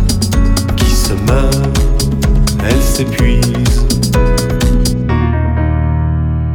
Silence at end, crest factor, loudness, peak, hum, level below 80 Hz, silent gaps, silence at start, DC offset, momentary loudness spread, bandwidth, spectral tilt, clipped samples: 0 s; 10 dB; -13 LUFS; 0 dBFS; none; -14 dBFS; none; 0 s; under 0.1%; 2 LU; 19.5 kHz; -5.5 dB/octave; under 0.1%